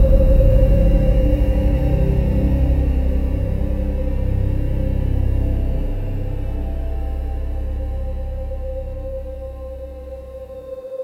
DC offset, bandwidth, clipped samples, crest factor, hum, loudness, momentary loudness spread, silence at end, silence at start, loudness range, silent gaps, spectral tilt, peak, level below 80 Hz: under 0.1%; 4.2 kHz; under 0.1%; 16 dB; none; -21 LUFS; 16 LU; 0 s; 0 s; 11 LU; none; -10 dB/octave; -2 dBFS; -18 dBFS